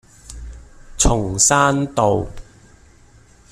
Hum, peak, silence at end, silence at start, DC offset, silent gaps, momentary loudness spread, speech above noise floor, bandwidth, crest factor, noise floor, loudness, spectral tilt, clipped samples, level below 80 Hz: none; -2 dBFS; 1.1 s; 0.3 s; under 0.1%; none; 26 LU; 32 dB; 15 kHz; 18 dB; -49 dBFS; -16 LUFS; -3.5 dB/octave; under 0.1%; -30 dBFS